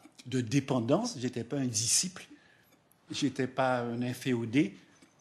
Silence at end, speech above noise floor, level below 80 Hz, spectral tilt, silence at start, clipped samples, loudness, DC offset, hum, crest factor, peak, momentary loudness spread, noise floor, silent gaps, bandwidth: 0.4 s; 34 dB; -74 dBFS; -4 dB/octave; 0.25 s; under 0.1%; -31 LUFS; under 0.1%; none; 18 dB; -14 dBFS; 9 LU; -65 dBFS; none; 13 kHz